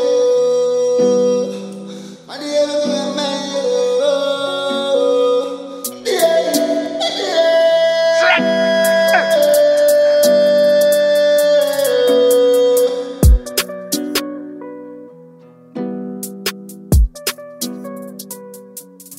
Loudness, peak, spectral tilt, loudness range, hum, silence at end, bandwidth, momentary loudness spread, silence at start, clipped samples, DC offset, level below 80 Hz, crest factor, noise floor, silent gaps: -15 LUFS; 0 dBFS; -4 dB/octave; 11 LU; none; 0.05 s; 16.5 kHz; 19 LU; 0 s; under 0.1%; under 0.1%; -26 dBFS; 14 dB; -42 dBFS; none